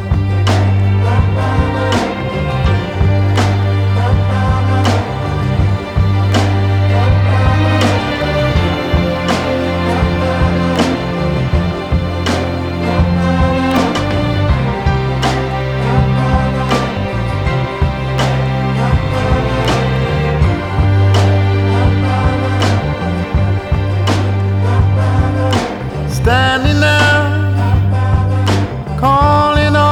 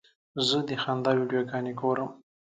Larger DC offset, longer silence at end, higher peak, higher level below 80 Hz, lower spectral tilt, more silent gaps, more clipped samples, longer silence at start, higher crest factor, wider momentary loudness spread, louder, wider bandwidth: neither; second, 0 s vs 0.35 s; first, 0 dBFS vs -12 dBFS; first, -24 dBFS vs -72 dBFS; first, -6.5 dB/octave vs -5 dB/octave; neither; neither; second, 0 s vs 0.35 s; second, 12 dB vs 18 dB; about the same, 5 LU vs 6 LU; first, -14 LUFS vs -28 LUFS; first, 10.5 kHz vs 9.4 kHz